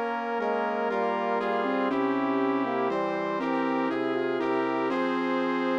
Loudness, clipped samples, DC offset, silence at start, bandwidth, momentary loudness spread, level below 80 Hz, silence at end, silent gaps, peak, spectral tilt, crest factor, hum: -27 LUFS; under 0.1%; under 0.1%; 0 s; 7.6 kHz; 2 LU; -80 dBFS; 0 s; none; -14 dBFS; -6.5 dB/octave; 12 dB; none